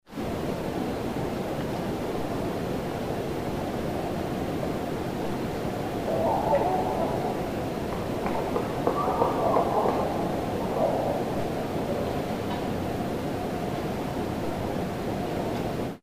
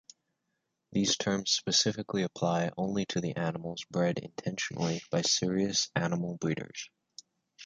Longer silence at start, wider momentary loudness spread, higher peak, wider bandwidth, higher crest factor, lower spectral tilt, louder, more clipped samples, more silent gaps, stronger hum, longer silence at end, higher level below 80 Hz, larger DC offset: second, 0.05 s vs 0.9 s; second, 6 LU vs 10 LU; about the same, -8 dBFS vs -10 dBFS; first, 15.5 kHz vs 9.4 kHz; about the same, 20 dB vs 22 dB; first, -6.5 dB/octave vs -3.5 dB/octave; about the same, -29 LUFS vs -31 LUFS; neither; neither; neither; about the same, 0.05 s vs 0 s; first, -46 dBFS vs -66 dBFS; first, 0.2% vs under 0.1%